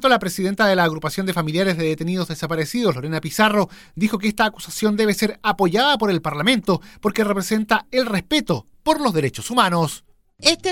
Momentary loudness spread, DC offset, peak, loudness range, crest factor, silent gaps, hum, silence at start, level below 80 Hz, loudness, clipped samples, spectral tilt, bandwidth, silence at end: 7 LU; under 0.1%; 0 dBFS; 2 LU; 20 dB; none; none; 0 s; -50 dBFS; -20 LUFS; under 0.1%; -4.5 dB/octave; 17.5 kHz; 0 s